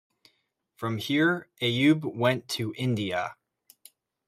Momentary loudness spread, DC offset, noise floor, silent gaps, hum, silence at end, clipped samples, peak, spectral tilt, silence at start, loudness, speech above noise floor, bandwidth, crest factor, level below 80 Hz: 9 LU; under 0.1%; -74 dBFS; none; none; 0.95 s; under 0.1%; -8 dBFS; -5.5 dB/octave; 0.8 s; -27 LUFS; 47 dB; 15.5 kHz; 20 dB; -70 dBFS